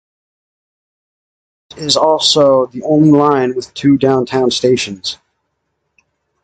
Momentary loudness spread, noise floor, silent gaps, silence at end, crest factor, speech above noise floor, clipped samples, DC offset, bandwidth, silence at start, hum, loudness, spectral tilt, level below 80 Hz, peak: 12 LU; -69 dBFS; none; 1.3 s; 14 dB; 58 dB; under 0.1%; under 0.1%; 9.4 kHz; 1.75 s; none; -12 LUFS; -5 dB/octave; -52 dBFS; 0 dBFS